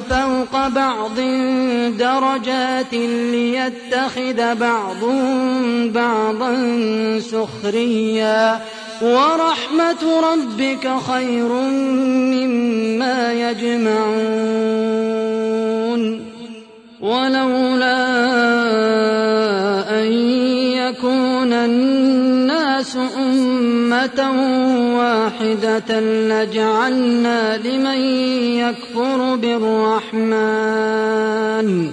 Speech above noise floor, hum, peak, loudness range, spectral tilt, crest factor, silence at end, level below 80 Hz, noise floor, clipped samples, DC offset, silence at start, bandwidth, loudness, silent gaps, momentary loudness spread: 22 dB; none; -4 dBFS; 2 LU; -5 dB/octave; 14 dB; 0 s; -50 dBFS; -39 dBFS; under 0.1%; under 0.1%; 0 s; 10.5 kHz; -17 LUFS; none; 4 LU